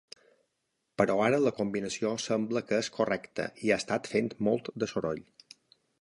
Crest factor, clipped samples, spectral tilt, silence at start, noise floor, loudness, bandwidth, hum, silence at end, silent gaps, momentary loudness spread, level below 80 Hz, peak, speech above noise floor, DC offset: 22 dB; under 0.1%; -5 dB/octave; 1 s; -81 dBFS; -30 LUFS; 11.5 kHz; none; 0.8 s; none; 8 LU; -66 dBFS; -10 dBFS; 51 dB; under 0.1%